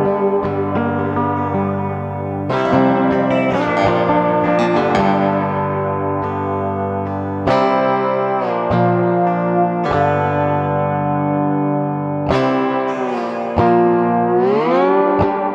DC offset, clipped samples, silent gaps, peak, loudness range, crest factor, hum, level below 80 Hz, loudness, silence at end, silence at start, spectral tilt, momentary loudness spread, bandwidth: under 0.1%; under 0.1%; none; -2 dBFS; 2 LU; 16 dB; none; -44 dBFS; -17 LUFS; 0 s; 0 s; -8.5 dB/octave; 6 LU; 8.2 kHz